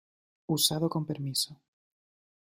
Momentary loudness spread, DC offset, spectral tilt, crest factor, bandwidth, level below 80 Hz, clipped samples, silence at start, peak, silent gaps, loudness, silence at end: 9 LU; under 0.1%; -4 dB/octave; 24 dB; 16 kHz; -70 dBFS; under 0.1%; 0.5 s; -10 dBFS; none; -29 LUFS; 0.95 s